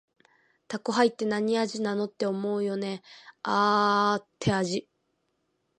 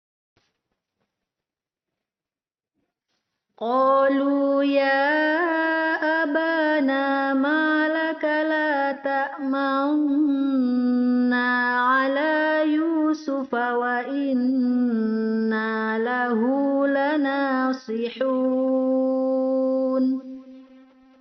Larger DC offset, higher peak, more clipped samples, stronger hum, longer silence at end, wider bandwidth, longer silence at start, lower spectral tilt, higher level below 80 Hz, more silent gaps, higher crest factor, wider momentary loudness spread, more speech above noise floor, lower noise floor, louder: neither; about the same, -8 dBFS vs -10 dBFS; neither; neither; first, 1 s vs 0.55 s; first, 9.6 kHz vs 6.2 kHz; second, 0.7 s vs 3.6 s; first, -5 dB/octave vs -2.5 dB/octave; first, -66 dBFS vs -72 dBFS; neither; first, 20 dB vs 14 dB; first, 12 LU vs 5 LU; second, 49 dB vs over 69 dB; second, -76 dBFS vs under -90 dBFS; second, -27 LUFS vs -22 LUFS